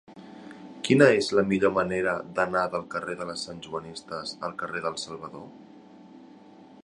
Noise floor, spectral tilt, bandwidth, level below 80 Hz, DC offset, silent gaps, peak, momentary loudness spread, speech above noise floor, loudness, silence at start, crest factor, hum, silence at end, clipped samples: -50 dBFS; -5 dB/octave; 11.5 kHz; -62 dBFS; under 0.1%; none; -2 dBFS; 25 LU; 24 dB; -26 LUFS; 0.1 s; 26 dB; none; 0.6 s; under 0.1%